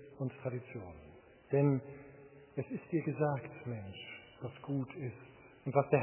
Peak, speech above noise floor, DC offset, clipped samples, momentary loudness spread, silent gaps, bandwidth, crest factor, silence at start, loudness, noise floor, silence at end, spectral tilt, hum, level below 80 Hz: -14 dBFS; 21 dB; under 0.1%; under 0.1%; 22 LU; none; 3.2 kHz; 22 dB; 0 s; -38 LUFS; -57 dBFS; 0 s; -7.5 dB/octave; none; -68 dBFS